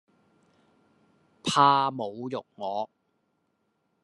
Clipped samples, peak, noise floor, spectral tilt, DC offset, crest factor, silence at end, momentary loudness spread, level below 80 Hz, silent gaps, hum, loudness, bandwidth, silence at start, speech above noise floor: under 0.1%; -6 dBFS; -75 dBFS; -4 dB/octave; under 0.1%; 24 dB; 1.2 s; 15 LU; -78 dBFS; none; none; -26 LUFS; 11.5 kHz; 1.45 s; 49 dB